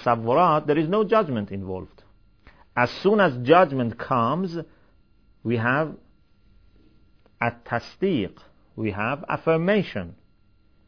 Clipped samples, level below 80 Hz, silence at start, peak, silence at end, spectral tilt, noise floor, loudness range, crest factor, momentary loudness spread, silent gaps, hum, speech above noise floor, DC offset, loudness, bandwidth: under 0.1%; -58 dBFS; 0 s; -4 dBFS; 0.75 s; -8 dB/octave; -61 dBFS; 7 LU; 20 dB; 14 LU; none; none; 38 dB; 0.2%; -23 LUFS; 5.4 kHz